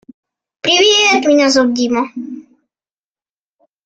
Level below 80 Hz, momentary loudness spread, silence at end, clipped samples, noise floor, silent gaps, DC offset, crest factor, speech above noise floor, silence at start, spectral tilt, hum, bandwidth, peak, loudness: -58 dBFS; 19 LU; 1.45 s; under 0.1%; under -90 dBFS; none; under 0.1%; 16 dB; over 78 dB; 0.65 s; -1.5 dB/octave; none; 9.2 kHz; 0 dBFS; -12 LUFS